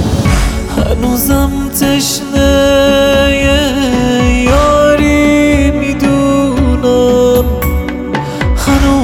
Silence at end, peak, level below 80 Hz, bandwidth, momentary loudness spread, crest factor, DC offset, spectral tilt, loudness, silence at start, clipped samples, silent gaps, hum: 0 s; 0 dBFS; -18 dBFS; over 20 kHz; 7 LU; 10 dB; under 0.1%; -5 dB/octave; -10 LUFS; 0 s; under 0.1%; none; none